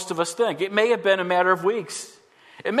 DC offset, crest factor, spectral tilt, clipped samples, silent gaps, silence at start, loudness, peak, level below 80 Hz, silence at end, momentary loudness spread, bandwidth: under 0.1%; 18 dB; -3.5 dB/octave; under 0.1%; none; 0 s; -22 LUFS; -4 dBFS; -78 dBFS; 0 s; 14 LU; 13.5 kHz